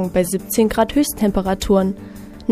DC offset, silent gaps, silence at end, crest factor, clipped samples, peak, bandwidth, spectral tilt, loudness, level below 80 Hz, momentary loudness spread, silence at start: under 0.1%; none; 0 s; 16 dB; under 0.1%; -2 dBFS; 15.5 kHz; -5.5 dB/octave; -18 LUFS; -36 dBFS; 11 LU; 0 s